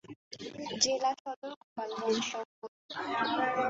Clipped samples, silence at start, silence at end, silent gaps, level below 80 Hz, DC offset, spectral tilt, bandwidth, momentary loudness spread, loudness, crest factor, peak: under 0.1%; 0.05 s; 0 s; 0.16-0.31 s, 1.20-1.25 s, 1.36-1.42 s, 1.56-1.76 s, 2.45-2.62 s, 2.68-2.89 s; -76 dBFS; under 0.1%; -1 dB/octave; 8 kHz; 16 LU; -33 LUFS; 22 dB; -14 dBFS